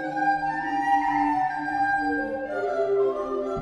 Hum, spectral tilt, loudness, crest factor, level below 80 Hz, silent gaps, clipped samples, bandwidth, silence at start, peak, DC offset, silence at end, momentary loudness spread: none; -6 dB/octave; -25 LUFS; 14 dB; -54 dBFS; none; under 0.1%; 10 kHz; 0 s; -12 dBFS; under 0.1%; 0 s; 6 LU